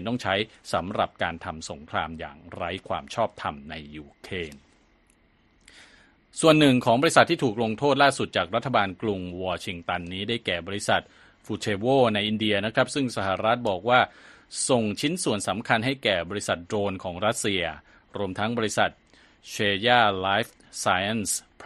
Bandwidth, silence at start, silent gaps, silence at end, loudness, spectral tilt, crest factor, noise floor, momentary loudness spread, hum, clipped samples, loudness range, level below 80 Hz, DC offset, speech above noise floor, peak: 12.5 kHz; 0 s; none; 0 s; -25 LUFS; -4 dB/octave; 26 dB; -62 dBFS; 15 LU; none; under 0.1%; 11 LU; -58 dBFS; under 0.1%; 37 dB; 0 dBFS